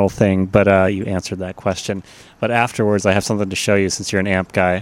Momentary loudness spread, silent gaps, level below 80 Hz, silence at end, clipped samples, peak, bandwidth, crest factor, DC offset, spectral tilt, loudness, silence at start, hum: 10 LU; none; -46 dBFS; 0 s; under 0.1%; 0 dBFS; 15.5 kHz; 16 dB; under 0.1%; -5 dB/octave; -18 LUFS; 0 s; none